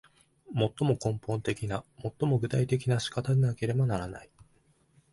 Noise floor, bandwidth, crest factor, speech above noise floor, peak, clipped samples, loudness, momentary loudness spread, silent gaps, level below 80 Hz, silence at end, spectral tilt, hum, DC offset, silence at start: -66 dBFS; 11.5 kHz; 16 dB; 38 dB; -14 dBFS; under 0.1%; -30 LUFS; 9 LU; none; -56 dBFS; 0.9 s; -7 dB/octave; none; under 0.1%; 0.5 s